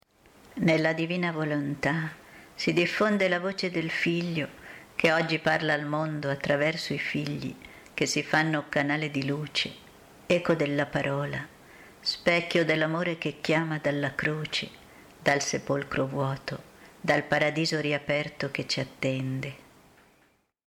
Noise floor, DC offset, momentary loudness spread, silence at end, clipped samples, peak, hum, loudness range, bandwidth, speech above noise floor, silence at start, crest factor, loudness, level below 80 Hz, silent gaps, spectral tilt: -66 dBFS; under 0.1%; 11 LU; 1.1 s; under 0.1%; -8 dBFS; none; 2 LU; 16 kHz; 39 dB; 0.55 s; 20 dB; -28 LUFS; -62 dBFS; none; -5 dB/octave